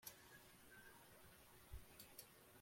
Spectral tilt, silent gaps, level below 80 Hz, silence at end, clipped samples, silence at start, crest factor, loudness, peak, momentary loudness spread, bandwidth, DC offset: -2.5 dB/octave; none; -70 dBFS; 0 s; under 0.1%; 0 s; 24 dB; -63 LUFS; -38 dBFS; 5 LU; 16.5 kHz; under 0.1%